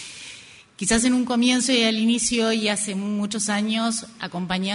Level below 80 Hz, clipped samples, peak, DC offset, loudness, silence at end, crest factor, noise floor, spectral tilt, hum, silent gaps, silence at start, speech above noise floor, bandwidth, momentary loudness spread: -52 dBFS; under 0.1%; -8 dBFS; under 0.1%; -22 LUFS; 0 s; 16 dB; -45 dBFS; -3 dB/octave; none; none; 0 s; 23 dB; 11 kHz; 13 LU